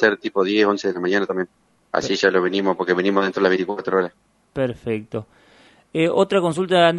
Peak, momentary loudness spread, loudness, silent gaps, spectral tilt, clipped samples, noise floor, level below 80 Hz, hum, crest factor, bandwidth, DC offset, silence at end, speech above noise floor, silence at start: 0 dBFS; 10 LU; -20 LUFS; none; -5.5 dB/octave; under 0.1%; -53 dBFS; -60 dBFS; none; 20 dB; 11.5 kHz; under 0.1%; 0 s; 33 dB; 0 s